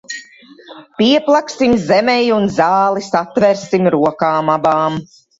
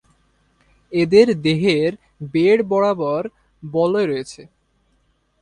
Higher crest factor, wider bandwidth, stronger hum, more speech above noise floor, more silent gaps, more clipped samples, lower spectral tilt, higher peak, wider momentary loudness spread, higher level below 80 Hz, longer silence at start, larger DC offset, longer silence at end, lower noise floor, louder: about the same, 14 dB vs 18 dB; second, 8 kHz vs 10.5 kHz; neither; second, 27 dB vs 46 dB; neither; neither; about the same, -5.5 dB/octave vs -6.5 dB/octave; about the same, 0 dBFS vs 0 dBFS; second, 6 LU vs 16 LU; first, -50 dBFS vs -56 dBFS; second, 0.1 s vs 0.9 s; neither; second, 0.35 s vs 1 s; second, -41 dBFS vs -63 dBFS; first, -14 LUFS vs -18 LUFS